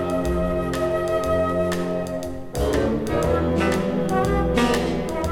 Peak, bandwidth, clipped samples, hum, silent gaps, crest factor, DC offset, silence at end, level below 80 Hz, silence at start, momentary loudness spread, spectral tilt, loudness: -8 dBFS; 18 kHz; under 0.1%; none; none; 14 dB; under 0.1%; 0 s; -34 dBFS; 0 s; 6 LU; -6 dB/octave; -23 LUFS